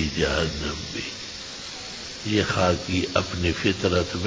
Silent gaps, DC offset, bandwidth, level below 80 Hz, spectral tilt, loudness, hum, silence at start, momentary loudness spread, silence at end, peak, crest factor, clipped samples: none; under 0.1%; 8 kHz; -38 dBFS; -4.5 dB/octave; -25 LUFS; none; 0 s; 11 LU; 0 s; -4 dBFS; 22 dB; under 0.1%